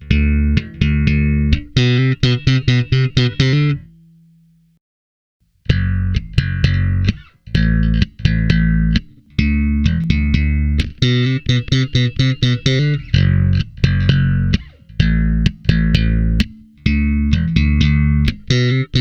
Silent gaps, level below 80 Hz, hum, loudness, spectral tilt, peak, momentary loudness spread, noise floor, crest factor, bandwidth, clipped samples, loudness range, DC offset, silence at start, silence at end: 4.81-5.40 s; -22 dBFS; none; -16 LUFS; -7 dB/octave; 0 dBFS; 5 LU; -52 dBFS; 16 dB; 7.4 kHz; under 0.1%; 4 LU; under 0.1%; 0 s; 0 s